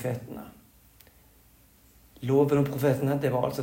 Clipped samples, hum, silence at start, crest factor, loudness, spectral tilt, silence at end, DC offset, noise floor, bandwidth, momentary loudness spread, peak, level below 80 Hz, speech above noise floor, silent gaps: under 0.1%; none; 0 s; 18 dB; -26 LUFS; -7.5 dB/octave; 0 s; under 0.1%; -58 dBFS; 16.5 kHz; 20 LU; -12 dBFS; -60 dBFS; 33 dB; none